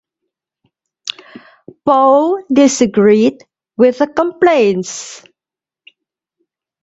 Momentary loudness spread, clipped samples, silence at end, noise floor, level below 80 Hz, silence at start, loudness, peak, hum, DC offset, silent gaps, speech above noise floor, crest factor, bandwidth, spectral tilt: 16 LU; under 0.1%; 1.65 s; -88 dBFS; -58 dBFS; 1.05 s; -12 LUFS; 0 dBFS; none; under 0.1%; none; 77 dB; 14 dB; 8.2 kHz; -4.5 dB/octave